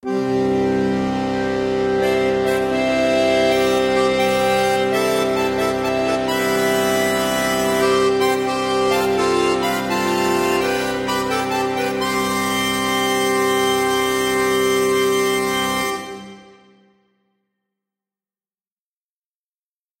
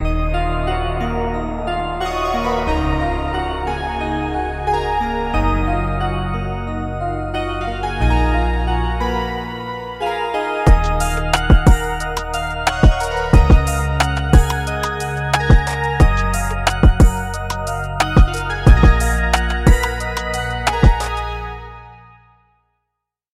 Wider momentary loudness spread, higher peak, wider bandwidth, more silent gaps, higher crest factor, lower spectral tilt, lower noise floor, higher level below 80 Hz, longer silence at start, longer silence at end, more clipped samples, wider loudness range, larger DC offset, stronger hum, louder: second, 4 LU vs 9 LU; second, -6 dBFS vs 0 dBFS; about the same, 16.5 kHz vs 15 kHz; neither; about the same, 14 dB vs 16 dB; second, -4 dB/octave vs -5.5 dB/octave; first, under -90 dBFS vs -79 dBFS; second, -48 dBFS vs -18 dBFS; about the same, 0.05 s vs 0 s; first, 3.6 s vs 1.4 s; neither; about the same, 3 LU vs 5 LU; neither; neither; about the same, -18 LUFS vs -18 LUFS